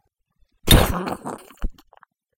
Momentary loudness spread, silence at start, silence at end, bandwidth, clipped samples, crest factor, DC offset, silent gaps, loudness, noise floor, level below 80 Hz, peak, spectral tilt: 21 LU; 0.65 s; 0.65 s; 17 kHz; under 0.1%; 22 dB; under 0.1%; none; -18 LUFS; -64 dBFS; -28 dBFS; 0 dBFS; -4 dB/octave